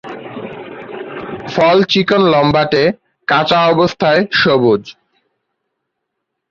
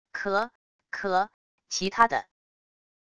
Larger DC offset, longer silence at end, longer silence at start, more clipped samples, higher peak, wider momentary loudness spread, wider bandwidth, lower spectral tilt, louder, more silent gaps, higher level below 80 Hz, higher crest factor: second, under 0.1% vs 0.2%; first, 1.6 s vs 0.8 s; about the same, 0.05 s vs 0.15 s; neither; first, 0 dBFS vs -6 dBFS; first, 17 LU vs 12 LU; second, 7.4 kHz vs 11 kHz; first, -6 dB/octave vs -3 dB/octave; first, -12 LUFS vs -27 LUFS; second, none vs 0.55-0.79 s, 1.34-1.58 s; first, -50 dBFS vs -64 dBFS; second, 14 dB vs 24 dB